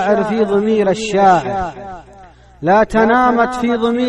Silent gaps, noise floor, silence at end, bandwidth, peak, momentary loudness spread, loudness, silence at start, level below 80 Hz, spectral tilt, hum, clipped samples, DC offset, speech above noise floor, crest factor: none; -41 dBFS; 0 s; 11.5 kHz; 0 dBFS; 11 LU; -14 LUFS; 0 s; -40 dBFS; -6 dB/octave; none; under 0.1%; under 0.1%; 27 dB; 14 dB